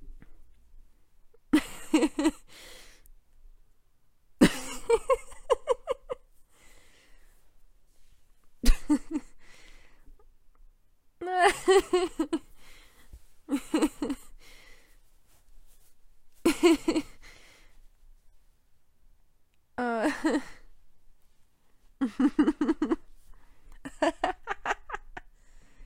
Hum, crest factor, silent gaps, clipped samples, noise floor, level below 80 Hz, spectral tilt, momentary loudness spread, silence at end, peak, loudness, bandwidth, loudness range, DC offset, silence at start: none; 26 dB; none; under 0.1%; -62 dBFS; -40 dBFS; -4.5 dB/octave; 18 LU; 0 s; -4 dBFS; -28 LUFS; 16 kHz; 7 LU; under 0.1%; 0 s